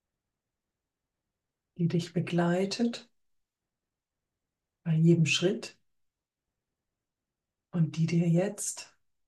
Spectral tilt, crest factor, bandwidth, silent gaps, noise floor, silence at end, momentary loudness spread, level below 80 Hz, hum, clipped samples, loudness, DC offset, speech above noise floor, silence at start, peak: -5.5 dB/octave; 20 dB; 12.5 kHz; none; -89 dBFS; 0.45 s; 13 LU; -76 dBFS; none; under 0.1%; -29 LUFS; under 0.1%; 61 dB; 1.8 s; -12 dBFS